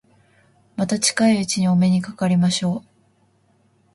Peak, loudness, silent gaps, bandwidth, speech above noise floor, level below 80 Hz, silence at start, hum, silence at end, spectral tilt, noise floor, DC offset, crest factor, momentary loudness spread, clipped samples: -4 dBFS; -19 LUFS; none; 11.5 kHz; 42 dB; -60 dBFS; 0.8 s; none; 1.15 s; -5 dB/octave; -60 dBFS; under 0.1%; 16 dB; 9 LU; under 0.1%